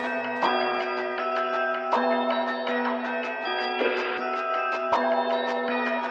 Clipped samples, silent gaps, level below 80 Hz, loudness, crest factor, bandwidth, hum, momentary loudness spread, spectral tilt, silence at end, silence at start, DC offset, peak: under 0.1%; none; -74 dBFS; -26 LUFS; 16 dB; 8 kHz; none; 4 LU; -4 dB/octave; 0 s; 0 s; under 0.1%; -10 dBFS